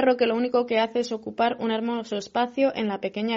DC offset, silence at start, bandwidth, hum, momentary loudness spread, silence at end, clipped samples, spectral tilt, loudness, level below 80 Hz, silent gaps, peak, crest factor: under 0.1%; 0 s; 7.6 kHz; none; 6 LU; 0 s; under 0.1%; -3 dB/octave; -25 LUFS; -68 dBFS; none; -10 dBFS; 14 dB